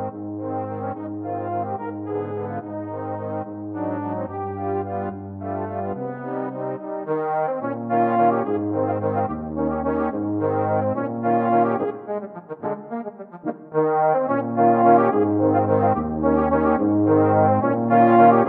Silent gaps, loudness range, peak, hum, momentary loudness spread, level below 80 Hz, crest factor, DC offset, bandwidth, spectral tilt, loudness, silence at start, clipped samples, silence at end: none; 10 LU; -2 dBFS; none; 13 LU; -50 dBFS; 18 dB; under 0.1%; 4.1 kHz; -12 dB/octave; -22 LUFS; 0 s; under 0.1%; 0 s